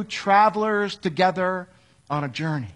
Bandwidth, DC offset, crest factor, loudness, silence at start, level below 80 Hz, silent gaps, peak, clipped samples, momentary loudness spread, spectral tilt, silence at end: 10.5 kHz; under 0.1%; 18 dB; -22 LUFS; 0 s; -64 dBFS; none; -6 dBFS; under 0.1%; 11 LU; -5.5 dB/octave; 0.05 s